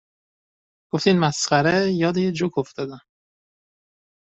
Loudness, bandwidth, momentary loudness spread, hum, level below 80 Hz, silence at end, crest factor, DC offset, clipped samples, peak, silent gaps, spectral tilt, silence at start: -21 LUFS; 8.2 kHz; 12 LU; none; -62 dBFS; 1.25 s; 20 dB; under 0.1%; under 0.1%; -4 dBFS; none; -5 dB/octave; 0.95 s